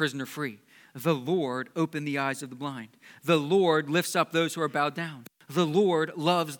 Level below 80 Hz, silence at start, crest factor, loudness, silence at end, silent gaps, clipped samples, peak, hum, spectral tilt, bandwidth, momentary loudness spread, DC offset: -84 dBFS; 0 s; 20 dB; -28 LUFS; 0 s; none; under 0.1%; -8 dBFS; none; -5 dB/octave; 19 kHz; 13 LU; under 0.1%